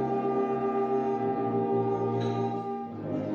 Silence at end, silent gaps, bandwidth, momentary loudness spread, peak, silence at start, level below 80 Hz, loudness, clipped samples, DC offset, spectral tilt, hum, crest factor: 0 s; none; 6.8 kHz; 6 LU; -16 dBFS; 0 s; -64 dBFS; -29 LUFS; under 0.1%; under 0.1%; -9 dB/octave; none; 12 dB